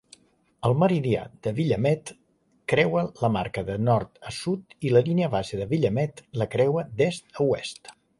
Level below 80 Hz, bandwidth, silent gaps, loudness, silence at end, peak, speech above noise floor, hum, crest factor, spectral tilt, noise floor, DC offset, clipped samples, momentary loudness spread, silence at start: -54 dBFS; 11.5 kHz; none; -25 LUFS; 0.3 s; -6 dBFS; 32 dB; none; 18 dB; -7 dB/octave; -56 dBFS; under 0.1%; under 0.1%; 9 LU; 0.6 s